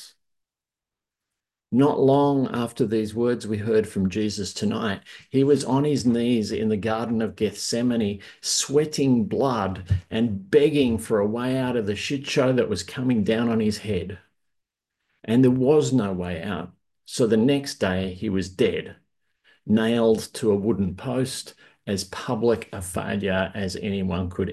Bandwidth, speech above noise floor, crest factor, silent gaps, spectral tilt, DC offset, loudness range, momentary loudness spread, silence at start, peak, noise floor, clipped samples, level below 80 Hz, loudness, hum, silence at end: 12.5 kHz; 67 dB; 16 dB; none; -5.5 dB/octave; under 0.1%; 3 LU; 10 LU; 0 s; -6 dBFS; -90 dBFS; under 0.1%; -46 dBFS; -23 LUFS; none; 0 s